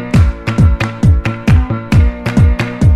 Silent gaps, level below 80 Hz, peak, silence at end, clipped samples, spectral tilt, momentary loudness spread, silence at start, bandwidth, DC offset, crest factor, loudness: none; -16 dBFS; 0 dBFS; 0 s; under 0.1%; -7.5 dB/octave; 2 LU; 0 s; 10.5 kHz; under 0.1%; 10 dB; -12 LUFS